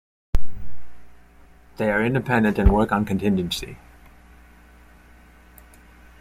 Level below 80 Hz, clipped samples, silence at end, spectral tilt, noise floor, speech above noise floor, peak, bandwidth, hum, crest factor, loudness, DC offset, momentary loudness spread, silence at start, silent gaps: -32 dBFS; under 0.1%; 2.45 s; -6.5 dB/octave; -50 dBFS; 29 dB; -4 dBFS; 15.5 kHz; none; 18 dB; -22 LUFS; under 0.1%; 21 LU; 0.35 s; none